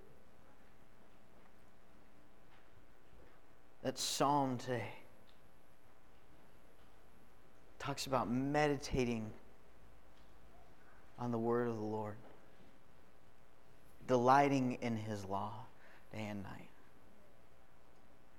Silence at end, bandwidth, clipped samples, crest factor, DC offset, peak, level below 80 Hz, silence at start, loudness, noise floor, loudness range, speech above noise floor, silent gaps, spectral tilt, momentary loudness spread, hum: 1.7 s; 18 kHz; under 0.1%; 26 dB; 0.3%; -16 dBFS; -64 dBFS; 3.85 s; -38 LUFS; -67 dBFS; 10 LU; 30 dB; none; -5 dB/octave; 21 LU; none